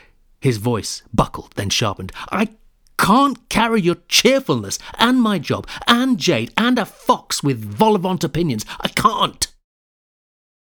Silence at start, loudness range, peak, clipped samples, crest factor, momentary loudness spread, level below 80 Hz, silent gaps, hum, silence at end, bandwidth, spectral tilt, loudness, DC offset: 0.4 s; 3 LU; 0 dBFS; under 0.1%; 18 dB; 9 LU; -44 dBFS; none; none; 1.25 s; over 20 kHz; -4 dB/octave; -18 LUFS; under 0.1%